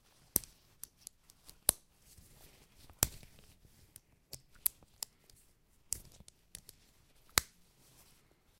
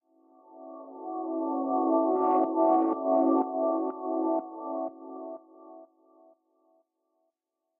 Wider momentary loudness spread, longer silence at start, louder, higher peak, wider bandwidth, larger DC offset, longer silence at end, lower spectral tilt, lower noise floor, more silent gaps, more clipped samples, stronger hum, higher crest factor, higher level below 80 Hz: first, 26 LU vs 19 LU; second, 0.35 s vs 0.5 s; second, -36 LUFS vs -28 LUFS; first, -2 dBFS vs -14 dBFS; first, 16 kHz vs 2.8 kHz; neither; second, 1.15 s vs 1.95 s; second, -1 dB/octave vs -8 dB/octave; second, -68 dBFS vs -84 dBFS; neither; neither; neither; first, 42 dB vs 16 dB; first, -60 dBFS vs -88 dBFS